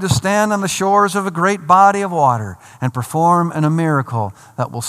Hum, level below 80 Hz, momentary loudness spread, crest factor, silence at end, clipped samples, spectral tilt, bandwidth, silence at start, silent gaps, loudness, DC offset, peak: none; -50 dBFS; 12 LU; 16 dB; 0 s; under 0.1%; -5.5 dB/octave; 15 kHz; 0 s; none; -15 LUFS; under 0.1%; 0 dBFS